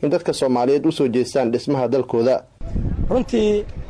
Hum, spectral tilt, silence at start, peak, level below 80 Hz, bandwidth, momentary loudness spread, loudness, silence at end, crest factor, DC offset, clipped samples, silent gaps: none; -6.5 dB/octave; 0 s; -8 dBFS; -32 dBFS; 11 kHz; 7 LU; -20 LUFS; 0 s; 10 dB; under 0.1%; under 0.1%; none